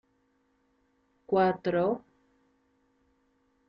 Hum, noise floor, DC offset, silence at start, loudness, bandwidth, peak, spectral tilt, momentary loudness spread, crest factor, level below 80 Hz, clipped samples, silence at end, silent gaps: none; -72 dBFS; under 0.1%; 1.3 s; -28 LUFS; 5.6 kHz; -14 dBFS; -5.5 dB/octave; 6 LU; 20 dB; -70 dBFS; under 0.1%; 1.7 s; none